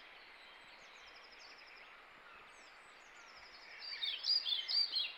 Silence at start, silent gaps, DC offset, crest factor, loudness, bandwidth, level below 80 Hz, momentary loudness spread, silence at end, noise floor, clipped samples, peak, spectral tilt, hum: 0 s; none; under 0.1%; 20 dB; -35 LUFS; 17 kHz; -82 dBFS; 24 LU; 0 s; -59 dBFS; under 0.1%; -24 dBFS; 1.5 dB/octave; none